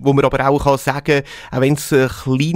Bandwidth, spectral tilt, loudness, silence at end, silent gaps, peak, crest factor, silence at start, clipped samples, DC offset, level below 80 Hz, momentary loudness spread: 16 kHz; -6 dB/octave; -16 LUFS; 0 s; none; 0 dBFS; 14 dB; 0 s; under 0.1%; under 0.1%; -38 dBFS; 4 LU